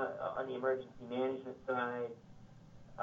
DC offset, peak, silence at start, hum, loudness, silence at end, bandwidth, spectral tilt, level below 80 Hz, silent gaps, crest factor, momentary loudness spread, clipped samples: under 0.1%; -22 dBFS; 0 s; none; -39 LUFS; 0 s; 7.4 kHz; -7 dB/octave; -70 dBFS; none; 18 dB; 22 LU; under 0.1%